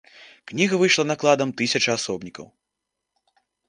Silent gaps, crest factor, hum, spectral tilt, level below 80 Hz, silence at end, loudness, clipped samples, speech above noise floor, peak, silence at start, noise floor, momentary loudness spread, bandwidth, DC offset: none; 20 dB; none; -3.5 dB/octave; -66 dBFS; 1.25 s; -21 LUFS; under 0.1%; 60 dB; -4 dBFS; 0.2 s; -82 dBFS; 15 LU; 10.5 kHz; under 0.1%